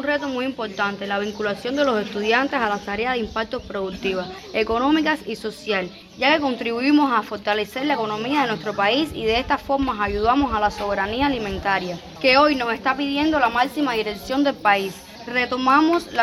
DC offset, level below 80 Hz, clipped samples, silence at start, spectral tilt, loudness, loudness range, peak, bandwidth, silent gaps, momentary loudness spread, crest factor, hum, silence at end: under 0.1%; -46 dBFS; under 0.1%; 0 s; -5 dB/octave; -21 LUFS; 3 LU; -4 dBFS; 14 kHz; none; 8 LU; 18 dB; none; 0 s